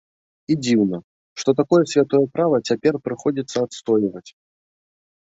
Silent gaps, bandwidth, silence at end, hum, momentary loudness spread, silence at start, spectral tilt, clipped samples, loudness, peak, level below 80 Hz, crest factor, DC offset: 1.04-1.36 s; 8 kHz; 0.95 s; none; 8 LU; 0.5 s; -6 dB/octave; under 0.1%; -20 LUFS; -4 dBFS; -62 dBFS; 16 dB; under 0.1%